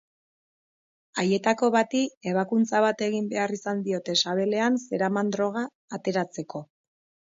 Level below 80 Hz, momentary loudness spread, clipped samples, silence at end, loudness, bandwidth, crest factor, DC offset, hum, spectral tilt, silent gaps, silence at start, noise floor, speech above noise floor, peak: -74 dBFS; 10 LU; under 0.1%; 0.65 s; -26 LUFS; 7.8 kHz; 18 dB; under 0.1%; none; -4.5 dB/octave; 2.17-2.21 s, 5.75-5.88 s; 1.15 s; under -90 dBFS; over 65 dB; -8 dBFS